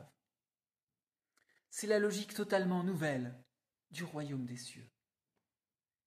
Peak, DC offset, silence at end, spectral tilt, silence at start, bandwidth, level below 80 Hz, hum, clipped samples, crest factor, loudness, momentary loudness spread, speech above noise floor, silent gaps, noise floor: -20 dBFS; under 0.1%; 1.2 s; -5 dB/octave; 0 s; 14.5 kHz; -82 dBFS; none; under 0.1%; 20 dB; -37 LUFS; 14 LU; over 53 dB; 0.83-0.87 s; under -90 dBFS